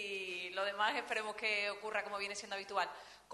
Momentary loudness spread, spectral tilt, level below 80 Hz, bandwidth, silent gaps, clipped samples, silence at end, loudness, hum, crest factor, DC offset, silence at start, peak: 6 LU; -1 dB/octave; -80 dBFS; 12 kHz; none; under 0.1%; 0 s; -38 LUFS; 50 Hz at -80 dBFS; 20 dB; under 0.1%; 0 s; -20 dBFS